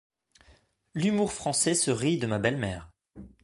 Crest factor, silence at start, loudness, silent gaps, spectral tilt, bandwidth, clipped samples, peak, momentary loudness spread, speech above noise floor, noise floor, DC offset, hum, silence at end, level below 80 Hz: 20 dB; 0.95 s; -27 LUFS; none; -4 dB/octave; 12 kHz; under 0.1%; -10 dBFS; 10 LU; 35 dB; -62 dBFS; under 0.1%; none; 0.15 s; -56 dBFS